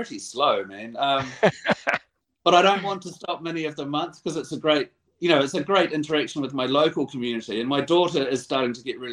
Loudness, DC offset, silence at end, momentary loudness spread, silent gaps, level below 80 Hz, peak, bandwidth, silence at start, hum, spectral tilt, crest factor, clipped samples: -24 LUFS; under 0.1%; 0 s; 10 LU; none; -66 dBFS; -2 dBFS; 11 kHz; 0 s; none; -4.5 dB/octave; 22 dB; under 0.1%